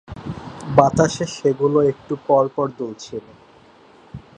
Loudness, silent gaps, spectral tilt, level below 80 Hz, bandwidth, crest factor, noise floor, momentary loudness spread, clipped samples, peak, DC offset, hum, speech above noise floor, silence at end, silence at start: -19 LUFS; none; -6 dB/octave; -48 dBFS; 9.6 kHz; 20 dB; -49 dBFS; 17 LU; under 0.1%; 0 dBFS; under 0.1%; none; 30 dB; 0.2 s; 0.1 s